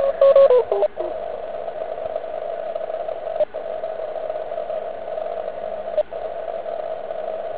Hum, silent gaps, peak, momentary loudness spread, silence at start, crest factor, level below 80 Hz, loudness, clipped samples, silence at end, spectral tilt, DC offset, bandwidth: none; none; -2 dBFS; 14 LU; 0 s; 20 dB; -58 dBFS; -23 LUFS; under 0.1%; 0 s; -8 dB/octave; 1%; 4 kHz